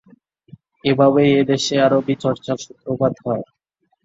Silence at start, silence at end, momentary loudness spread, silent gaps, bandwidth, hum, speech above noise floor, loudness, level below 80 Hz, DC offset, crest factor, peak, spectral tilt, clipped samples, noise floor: 0.85 s; 0.6 s; 12 LU; none; 7.8 kHz; none; 35 dB; -18 LUFS; -58 dBFS; under 0.1%; 16 dB; -2 dBFS; -5.5 dB/octave; under 0.1%; -53 dBFS